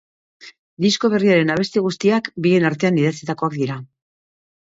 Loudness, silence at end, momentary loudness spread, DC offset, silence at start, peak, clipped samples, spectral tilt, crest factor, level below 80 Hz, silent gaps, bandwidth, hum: -18 LUFS; 0.9 s; 8 LU; under 0.1%; 0.45 s; -4 dBFS; under 0.1%; -6 dB/octave; 16 dB; -60 dBFS; 0.59-0.77 s; 8 kHz; none